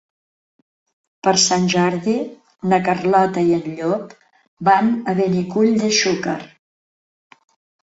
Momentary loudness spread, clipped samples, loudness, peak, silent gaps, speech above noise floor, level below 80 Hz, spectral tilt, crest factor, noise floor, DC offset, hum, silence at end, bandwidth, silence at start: 10 LU; under 0.1%; -18 LUFS; -2 dBFS; 4.48-4.57 s; over 73 dB; -60 dBFS; -4 dB/octave; 18 dB; under -90 dBFS; under 0.1%; none; 1.4 s; 8 kHz; 1.25 s